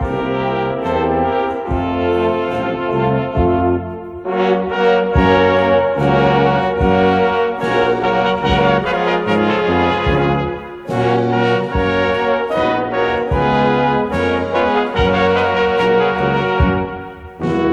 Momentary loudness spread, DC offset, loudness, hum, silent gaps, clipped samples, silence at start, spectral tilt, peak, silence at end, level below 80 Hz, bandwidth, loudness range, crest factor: 6 LU; under 0.1%; -16 LUFS; none; none; under 0.1%; 0 s; -7.5 dB/octave; 0 dBFS; 0 s; -30 dBFS; 9 kHz; 3 LU; 14 dB